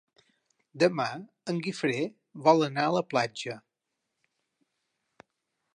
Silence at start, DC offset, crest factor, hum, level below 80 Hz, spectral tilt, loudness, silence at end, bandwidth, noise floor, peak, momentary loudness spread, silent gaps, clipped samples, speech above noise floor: 0.75 s; under 0.1%; 22 dB; none; -80 dBFS; -5.5 dB/octave; -28 LUFS; 2.15 s; 11 kHz; -84 dBFS; -8 dBFS; 14 LU; none; under 0.1%; 56 dB